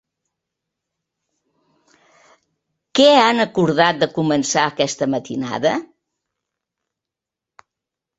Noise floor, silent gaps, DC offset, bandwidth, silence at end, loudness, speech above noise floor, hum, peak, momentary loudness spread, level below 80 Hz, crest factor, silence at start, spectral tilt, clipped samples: -86 dBFS; none; under 0.1%; 8.2 kHz; 2.35 s; -17 LUFS; 70 dB; none; -2 dBFS; 11 LU; -62 dBFS; 20 dB; 2.95 s; -4 dB/octave; under 0.1%